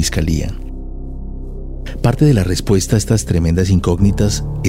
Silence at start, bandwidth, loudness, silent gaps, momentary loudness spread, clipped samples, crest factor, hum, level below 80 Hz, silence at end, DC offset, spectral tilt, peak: 0 s; 16 kHz; -15 LUFS; none; 17 LU; under 0.1%; 14 dB; none; -24 dBFS; 0 s; under 0.1%; -6 dB/octave; -2 dBFS